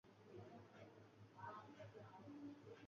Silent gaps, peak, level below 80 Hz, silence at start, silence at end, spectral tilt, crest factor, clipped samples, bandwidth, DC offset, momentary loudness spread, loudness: none; -44 dBFS; -86 dBFS; 0.05 s; 0 s; -5.5 dB/octave; 16 dB; under 0.1%; 7.2 kHz; under 0.1%; 7 LU; -60 LUFS